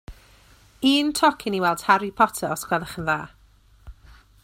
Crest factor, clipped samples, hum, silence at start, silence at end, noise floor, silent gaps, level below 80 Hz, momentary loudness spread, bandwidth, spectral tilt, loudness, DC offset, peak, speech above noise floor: 22 dB; under 0.1%; none; 0.1 s; 0.5 s; -55 dBFS; none; -50 dBFS; 8 LU; 16 kHz; -3.5 dB/octave; -22 LUFS; under 0.1%; -2 dBFS; 33 dB